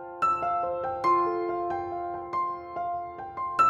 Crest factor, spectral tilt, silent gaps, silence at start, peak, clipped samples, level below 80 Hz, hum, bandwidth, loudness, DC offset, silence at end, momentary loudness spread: 16 dB; -6 dB/octave; none; 0 s; -12 dBFS; under 0.1%; -60 dBFS; none; 10.5 kHz; -29 LUFS; under 0.1%; 0 s; 9 LU